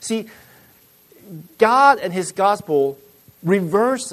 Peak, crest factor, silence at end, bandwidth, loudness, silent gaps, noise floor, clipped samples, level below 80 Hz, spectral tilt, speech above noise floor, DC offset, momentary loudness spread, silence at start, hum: 0 dBFS; 18 dB; 0 s; 13.5 kHz; -18 LUFS; none; -52 dBFS; under 0.1%; -66 dBFS; -5 dB/octave; 34 dB; under 0.1%; 19 LU; 0 s; none